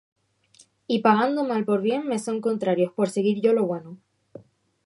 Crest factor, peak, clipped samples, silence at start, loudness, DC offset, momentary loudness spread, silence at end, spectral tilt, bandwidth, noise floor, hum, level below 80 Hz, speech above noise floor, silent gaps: 20 dB; -4 dBFS; under 0.1%; 0.9 s; -23 LUFS; under 0.1%; 7 LU; 0.9 s; -6 dB/octave; 11.5 kHz; -58 dBFS; none; -74 dBFS; 35 dB; none